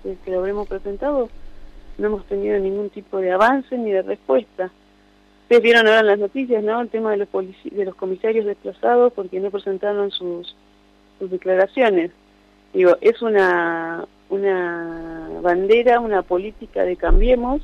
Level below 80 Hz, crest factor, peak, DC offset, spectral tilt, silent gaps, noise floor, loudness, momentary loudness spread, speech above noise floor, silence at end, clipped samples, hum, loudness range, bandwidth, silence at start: -30 dBFS; 14 dB; -4 dBFS; under 0.1%; -6 dB/octave; none; -53 dBFS; -19 LUFS; 14 LU; 35 dB; 0 s; under 0.1%; 50 Hz at -60 dBFS; 4 LU; 9.2 kHz; 0.05 s